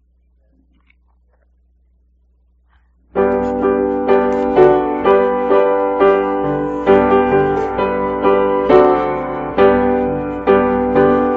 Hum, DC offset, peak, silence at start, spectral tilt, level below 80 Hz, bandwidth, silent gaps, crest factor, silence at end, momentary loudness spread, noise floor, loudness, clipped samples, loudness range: none; under 0.1%; 0 dBFS; 3.15 s; -5.5 dB/octave; -40 dBFS; 4.6 kHz; none; 14 dB; 0 s; 7 LU; -56 dBFS; -14 LUFS; under 0.1%; 8 LU